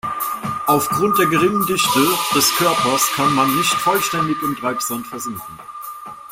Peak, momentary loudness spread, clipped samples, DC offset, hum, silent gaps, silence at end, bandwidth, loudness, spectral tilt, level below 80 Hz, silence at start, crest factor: -2 dBFS; 17 LU; under 0.1%; under 0.1%; none; none; 0 s; 16.5 kHz; -17 LUFS; -3 dB/octave; -54 dBFS; 0.05 s; 16 dB